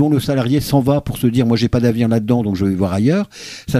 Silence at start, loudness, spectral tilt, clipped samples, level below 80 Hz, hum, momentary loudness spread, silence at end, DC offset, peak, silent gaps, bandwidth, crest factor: 0 s; -16 LUFS; -7 dB/octave; under 0.1%; -40 dBFS; none; 3 LU; 0 s; under 0.1%; -2 dBFS; none; 15.5 kHz; 14 dB